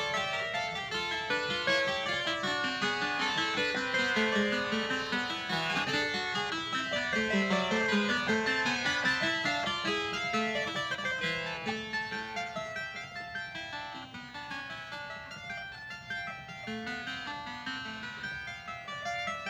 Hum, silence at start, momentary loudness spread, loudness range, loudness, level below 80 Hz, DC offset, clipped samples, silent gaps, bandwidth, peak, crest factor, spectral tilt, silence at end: none; 0 s; 12 LU; 10 LU; -32 LUFS; -62 dBFS; under 0.1%; under 0.1%; none; over 20 kHz; -16 dBFS; 18 dB; -3.5 dB/octave; 0 s